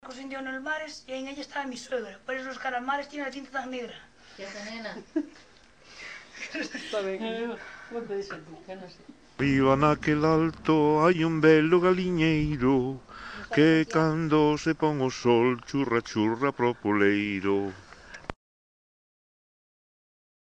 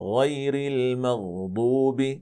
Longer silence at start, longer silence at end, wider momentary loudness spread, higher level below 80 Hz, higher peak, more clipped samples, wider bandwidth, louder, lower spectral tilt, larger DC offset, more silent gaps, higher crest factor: about the same, 0.05 s vs 0 s; first, 2.2 s vs 0 s; first, 20 LU vs 5 LU; first, -54 dBFS vs -68 dBFS; about the same, -8 dBFS vs -10 dBFS; neither; about the same, 9.2 kHz vs 10 kHz; about the same, -26 LUFS vs -25 LUFS; about the same, -6.5 dB/octave vs -7 dB/octave; neither; neither; first, 20 dB vs 14 dB